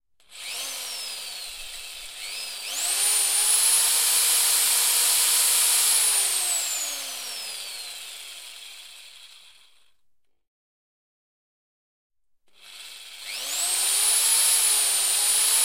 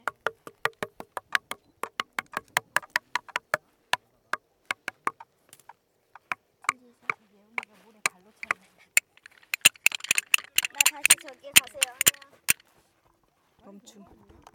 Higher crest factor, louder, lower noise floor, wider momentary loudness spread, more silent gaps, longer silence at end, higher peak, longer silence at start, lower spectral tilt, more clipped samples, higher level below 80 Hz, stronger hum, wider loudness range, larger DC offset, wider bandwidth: second, 18 dB vs 30 dB; first, -20 LUFS vs -26 LUFS; about the same, -69 dBFS vs -68 dBFS; first, 20 LU vs 16 LU; first, 10.48-12.10 s vs none; second, 0 s vs 2 s; second, -8 dBFS vs 0 dBFS; first, 0.3 s vs 0.05 s; second, 4.5 dB/octave vs 1.5 dB/octave; neither; about the same, -66 dBFS vs -70 dBFS; neither; first, 19 LU vs 13 LU; first, 0.1% vs under 0.1%; about the same, 16.5 kHz vs 18 kHz